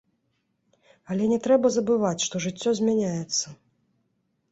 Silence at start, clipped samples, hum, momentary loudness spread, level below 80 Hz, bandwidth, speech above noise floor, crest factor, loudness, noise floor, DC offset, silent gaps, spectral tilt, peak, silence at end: 1.1 s; under 0.1%; none; 7 LU; -66 dBFS; 8.2 kHz; 50 dB; 18 dB; -24 LUFS; -74 dBFS; under 0.1%; none; -4.5 dB/octave; -8 dBFS; 1 s